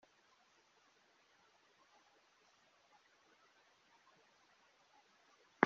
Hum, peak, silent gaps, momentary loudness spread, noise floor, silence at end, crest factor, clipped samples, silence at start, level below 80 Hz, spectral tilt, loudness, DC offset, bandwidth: none; -10 dBFS; none; 0 LU; -73 dBFS; 0 s; 40 dB; under 0.1%; 5.6 s; under -90 dBFS; -4 dB/octave; -70 LUFS; under 0.1%; 7.2 kHz